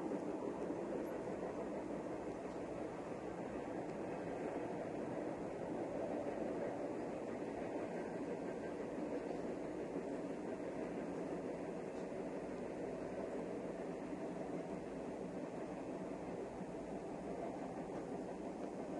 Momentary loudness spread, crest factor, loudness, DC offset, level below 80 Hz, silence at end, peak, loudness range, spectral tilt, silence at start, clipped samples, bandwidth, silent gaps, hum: 3 LU; 14 dB; -45 LUFS; under 0.1%; -70 dBFS; 0 s; -30 dBFS; 2 LU; -7 dB/octave; 0 s; under 0.1%; 12 kHz; none; none